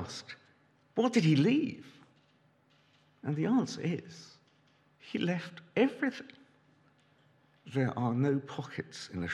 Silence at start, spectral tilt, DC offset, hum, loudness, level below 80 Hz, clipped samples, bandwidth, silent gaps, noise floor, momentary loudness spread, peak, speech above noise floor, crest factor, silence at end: 0 s; -6.5 dB/octave; under 0.1%; none; -32 LUFS; -78 dBFS; under 0.1%; 11 kHz; none; -68 dBFS; 21 LU; -14 dBFS; 36 dB; 20 dB; 0 s